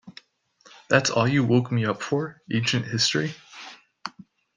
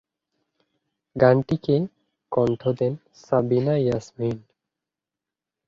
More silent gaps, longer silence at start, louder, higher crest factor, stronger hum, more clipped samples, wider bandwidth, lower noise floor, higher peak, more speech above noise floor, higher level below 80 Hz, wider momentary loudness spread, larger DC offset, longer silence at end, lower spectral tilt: neither; second, 0.05 s vs 1.15 s; about the same, -23 LUFS vs -23 LUFS; about the same, 22 dB vs 22 dB; neither; neither; first, 9.8 kHz vs 7.4 kHz; second, -58 dBFS vs -88 dBFS; about the same, -4 dBFS vs -2 dBFS; second, 35 dB vs 66 dB; second, -64 dBFS vs -58 dBFS; first, 19 LU vs 13 LU; neither; second, 0.45 s vs 1.3 s; second, -4.5 dB/octave vs -8.5 dB/octave